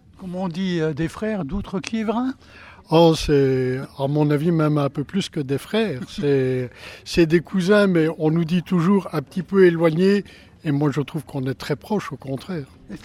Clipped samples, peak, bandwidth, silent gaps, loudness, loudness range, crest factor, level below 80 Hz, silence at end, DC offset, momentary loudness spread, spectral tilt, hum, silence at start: under 0.1%; -4 dBFS; 15 kHz; none; -21 LUFS; 3 LU; 18 dB; -46 dBFS; 0.05 s; under 0.1%; 13 LU; -7 dB/octave; none; 0.2 s